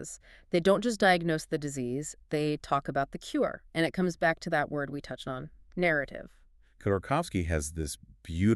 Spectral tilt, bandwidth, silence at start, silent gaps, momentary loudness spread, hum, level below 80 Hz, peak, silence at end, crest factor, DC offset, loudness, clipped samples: -5.5 dB/octave; 13.5 kHz; 0 s; none; 14 LU; none; -50 dBFS; -10 dBFS; 0 s; 20 dB; under 0.1%; -30 LUFS; under 0.1%